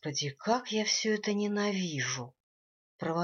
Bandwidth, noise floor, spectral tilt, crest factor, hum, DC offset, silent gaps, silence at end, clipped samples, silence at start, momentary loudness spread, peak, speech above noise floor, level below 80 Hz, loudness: 7.4 kHz; under -90 dBFS; -3.5 dB/octave; 18 dB; none; under 0.1%; 2.40-2.99 s; 0 s; under 0.1%; 0.05 s; 9 LU; -14 dBFS; over 58 dB; -78 dBFS; -31 LUFS